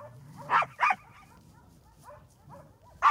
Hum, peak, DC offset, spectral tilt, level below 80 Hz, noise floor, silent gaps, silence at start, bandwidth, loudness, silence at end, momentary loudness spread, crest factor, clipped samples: none; -10 dBFS; under 0.1%; -3.5 dB/octave; -66 dBFS; -57 dBFS; none; 0 s; 16 kHz; -28 LUFS; 0 s; 26 LU; 22 dB; under 0.1%